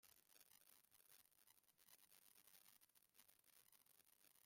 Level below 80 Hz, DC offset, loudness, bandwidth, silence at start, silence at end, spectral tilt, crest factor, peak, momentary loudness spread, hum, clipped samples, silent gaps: under -90 dBFS; under 0.1%; -70 LUFS; 16.5 kHz; 0 s; 0 s; 0 dB/octave; 26 dB; -48 dBFS; 1 LU; none; under 0.1%; none